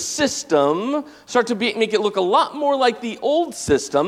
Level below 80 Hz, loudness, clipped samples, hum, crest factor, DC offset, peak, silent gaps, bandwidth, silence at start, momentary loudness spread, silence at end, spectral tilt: -52 dBFS; -20 LUFS; under 0.1%; none; 16 dB; under 0.1%; -4 dBFS; none; 15 kHz; 0 s; 4 LU; 0 s; -3.5 dB/octave